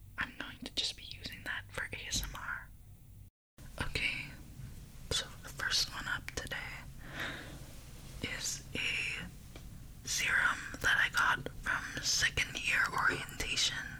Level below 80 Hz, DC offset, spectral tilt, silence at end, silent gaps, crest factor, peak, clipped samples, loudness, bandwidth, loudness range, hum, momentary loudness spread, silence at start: -52 dBFS; under 0.1%; -1.5 dB/octave; 0 s; 3.30-3.57 s; 18 dB; -20 dBFS; under 0.1%; -34 LUFS; over 20 kHz; 9 LU; none; 21 LU; 0 s